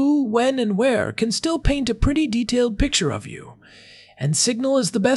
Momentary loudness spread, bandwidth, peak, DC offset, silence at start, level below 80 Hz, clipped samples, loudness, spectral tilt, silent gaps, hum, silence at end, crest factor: 7 LU; 12 kHz; -4 dBFS; under 0.1%; 0 s; -32 dBFS; under 0.1%; -20 LUFS; -4.5 dB/octave; none; none; 0 s; 16 dB